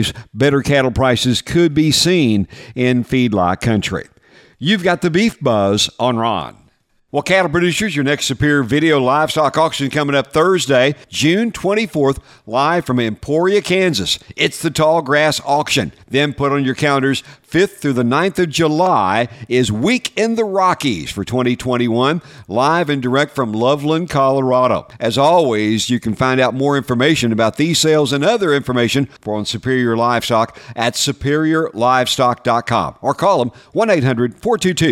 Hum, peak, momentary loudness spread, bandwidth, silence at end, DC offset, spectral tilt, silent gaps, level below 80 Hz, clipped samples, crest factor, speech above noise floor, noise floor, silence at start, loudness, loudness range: none; 0 dBFS; 6 LU; 16.5 kHz; 0 s; under 0.1%; -5 dB/octave; none; -44 dBFS; under 0.1%; 14 dB; 41 dB; -56 dBFS; 0 s; -15 LUFS; 2 LU